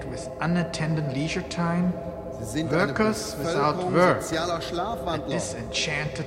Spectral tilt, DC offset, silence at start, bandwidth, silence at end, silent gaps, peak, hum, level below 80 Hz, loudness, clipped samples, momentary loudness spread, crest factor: -5 dB/octave; under 0.1%; 0 s; 16 kHz; 0 s; none; -6 dBFS; none; -46 dBFS; -26 LUFS; under 0.1%; 8 LU; 20 dB